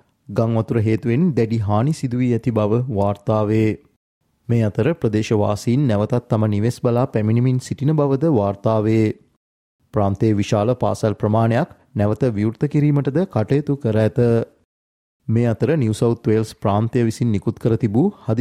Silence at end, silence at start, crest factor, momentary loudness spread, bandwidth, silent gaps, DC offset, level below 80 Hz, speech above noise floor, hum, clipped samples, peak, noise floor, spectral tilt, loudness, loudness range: 0 s; 0.3 s; 16 dB; 4 LU; 12 kHz; 3.96-4.21 s, 9.37-9.79 s, 14.65-15.20 s; under 0.1%; -52 dBFS; over 72 dB; none; under 0.1%; -4 dBFS; under -90 dBFS; -8 dB/octave; -19 LUFS; 1 LU